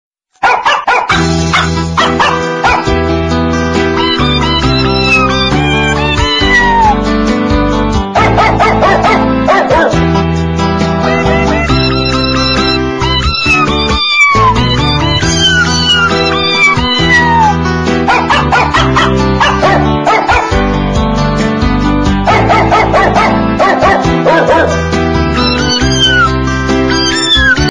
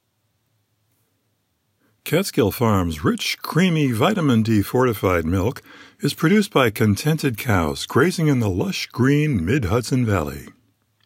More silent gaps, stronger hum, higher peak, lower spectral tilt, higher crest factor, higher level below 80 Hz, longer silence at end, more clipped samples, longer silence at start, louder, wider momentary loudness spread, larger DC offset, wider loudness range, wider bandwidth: neither; neither; first, 0 dBFS vs -4 dBFS; second, -4.5 dB/octave vs -6 dB/octave; second, 10 dB vs 16 dB; first, -20 dBFS vs -44 dBFS; second, 0 s vs 0.55 s; neither; second, 0.4 s vs 2.05 s; first, -9 LUFS vs -20 LUFS; about the same, 5 LU vs 6 LU; neither; about the same, 2 LU vs 3 LU; second, 10.5 kHz vs 16.5 kHz